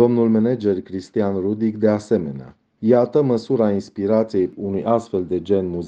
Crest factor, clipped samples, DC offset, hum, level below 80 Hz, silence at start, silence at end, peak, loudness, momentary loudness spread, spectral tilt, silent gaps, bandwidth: 16 dB; under 0.1%; under 0.1%; none; -58 dBFS; 0 s; 0 s; -2 dBFS; -20 LUFS; 8 LU; -8.5 dB/octave; none; 8.6 kHz